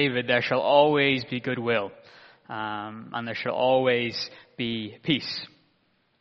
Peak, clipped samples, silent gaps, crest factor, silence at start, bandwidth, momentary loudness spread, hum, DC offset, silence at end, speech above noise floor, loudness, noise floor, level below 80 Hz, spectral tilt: -6 dBFS; under 0.1%; none; 20 dB; 0 s; 7 kHz; 15 LU; none; under 0.1%; 0.75 s; 43 dB; -25 LUFS; -68 dBFS; -66 dBFS; -3 dB/octave